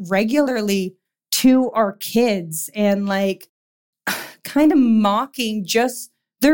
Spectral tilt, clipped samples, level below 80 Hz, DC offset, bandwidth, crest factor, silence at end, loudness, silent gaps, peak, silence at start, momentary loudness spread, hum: -4.5 dB/octave; under 0.1%; -56 dBFS; 0.2%; 17 kHz; 14 dB; 0 s; -19 LUFS; 3.49-3.93 s; -6 dBFS; 0 s; 11 LU; none